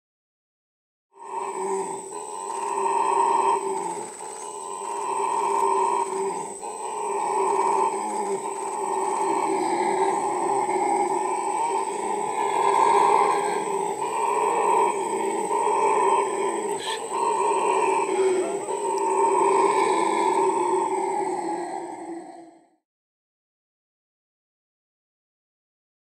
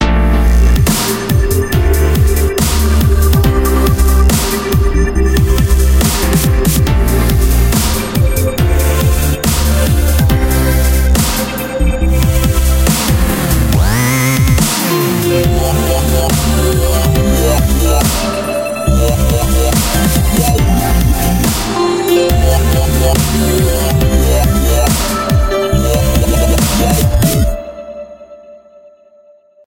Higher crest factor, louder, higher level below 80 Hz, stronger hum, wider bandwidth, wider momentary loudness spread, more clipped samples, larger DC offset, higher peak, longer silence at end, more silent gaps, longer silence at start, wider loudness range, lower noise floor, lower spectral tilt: first, 18 dB vs 10 dB; second, -24 LUFS vs -12 LUFS; second, -78 dBFS vs -14 dBFS; neither; second, 15 kHz vs 17.5 kHz; first, 11 LU vs 3 LU; neither; neither; second, -6 dBFS vs 0 dBFS; first, 3.5 s vs 1.1 s; neither; first, 1.15 s vs 0 s; first, 5 LU vs 1 LU; first, -49 dBFS vs -45 dBFS; second, -3 dB/octave vs -5 dB/octave